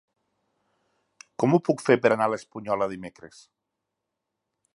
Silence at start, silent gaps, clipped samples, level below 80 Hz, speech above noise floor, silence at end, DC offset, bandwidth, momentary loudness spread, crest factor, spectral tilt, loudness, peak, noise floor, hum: 1.4 s; none; under 0.1%; -70 dBFS; 59 dB; 1.5 s; under 0.1%; 11.5 kHz; 18 LU; 24 dB; -6.5 dB/octave; -24 LUFS; -4 dBFS; -83 dBFS; none